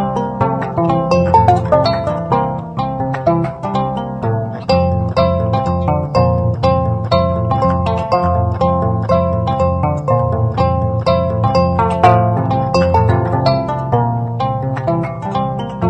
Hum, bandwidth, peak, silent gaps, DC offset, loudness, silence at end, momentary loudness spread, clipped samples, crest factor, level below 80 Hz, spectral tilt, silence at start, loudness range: none; 8.6 kHz; 0 dBFS; none; under 0.1%; -15 LUFS; 0 s; 7 LU; under 0.1%; 14 dB; -32 dBFS; -8.5 dB/octave; 0 s; 3 LU